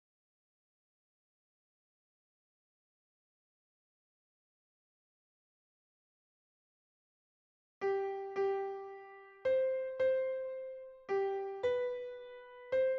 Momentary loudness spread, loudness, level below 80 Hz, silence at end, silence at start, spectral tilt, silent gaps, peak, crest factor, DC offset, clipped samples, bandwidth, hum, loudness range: 16 LU; -37 LUFS; -80 dBFS; 0 s; 7.8 s; -3 dB/octave; none; -24 dBFS; 16 dB; under 0.1%; under 0.1%; 6.2 kHz; none; 8 LU